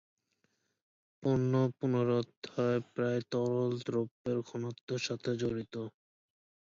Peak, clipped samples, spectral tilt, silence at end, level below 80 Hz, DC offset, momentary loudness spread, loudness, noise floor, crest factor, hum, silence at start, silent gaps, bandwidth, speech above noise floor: -20 dBFS; under 0.1%; -7 dB/octave; 0.85 s; -70 dBFS; under 0.1%; 10 LU; -34 LUFS; -79 dBFS; 16 dB; none; 1.2 s; 2.37-2.42 s, 4.11-4.25 s, 4.81-4.88 s; 7.6 kHz; 46 dB